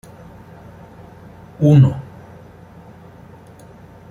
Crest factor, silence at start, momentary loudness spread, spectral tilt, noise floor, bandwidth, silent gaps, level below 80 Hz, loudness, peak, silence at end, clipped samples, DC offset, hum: 18 dB; 1.6 s; 29 LU; -9.5 dB/octave; -42 dBFS; 6.8 kHz; none; -50 dBFS; -14 LUFS; -2 dBFS; 2.1 s; under 0.1%; under 0.1%; none